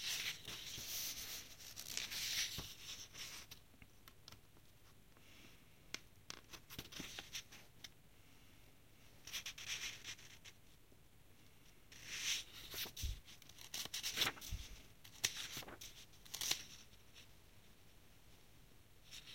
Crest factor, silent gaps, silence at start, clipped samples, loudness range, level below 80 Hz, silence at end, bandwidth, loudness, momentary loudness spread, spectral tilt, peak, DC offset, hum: 32 dB; none; 0 s; under 0.1%; 11 LU; -62 dBFS; 0 s; 16.5 kHz; -45 LUFS; 25 LU; -0.5 dB/octave; -18 dBFS; under 0.1%; none